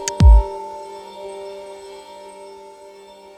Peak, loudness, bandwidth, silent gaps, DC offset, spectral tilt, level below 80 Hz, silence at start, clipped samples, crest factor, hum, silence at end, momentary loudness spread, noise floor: 0 dBFS; -15 LUFS; 9.6 kHz; none; under 0.1%; -6 dB/octave; -20 dBFS; 0 s; under 0.1%; 18 dB; none; 1.85 s; 28 LU; -42 dBFS